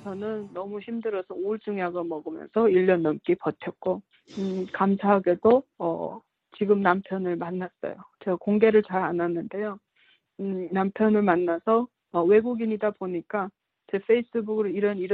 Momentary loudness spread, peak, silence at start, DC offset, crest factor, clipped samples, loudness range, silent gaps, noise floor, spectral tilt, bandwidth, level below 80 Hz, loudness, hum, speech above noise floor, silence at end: 13 LU; -6 dBFS; 0 s; under 0.1%; 20 dB; under 0.1%; 2 LU; none; -64 dBFS; -9 dB/octave; 6 kHz; -68 dBFS; -26 LUFS; none; 39 dB; 0 s